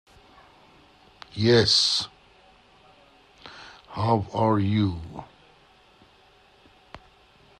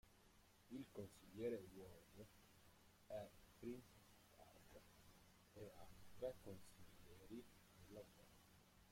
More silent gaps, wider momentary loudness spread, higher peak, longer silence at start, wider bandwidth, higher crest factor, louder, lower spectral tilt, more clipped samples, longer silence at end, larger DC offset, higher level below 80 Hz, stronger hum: neither; first, 25 LU vs 16 LU; first, -8 dBFS vs -38 dBFS; first, 1.35 s vs 0.05 s; second, 11 kHz vs 16.5 kHz; about the same, 20 dB vs 20 dB; first, -22 LUFS vs -58 LUFS; about the same, -5 dB/octave vs -5.5 dB/octave; neither; first, 0.65 s vs 0 s; neither; first, -56 dBFS vs -76 dBFS; neither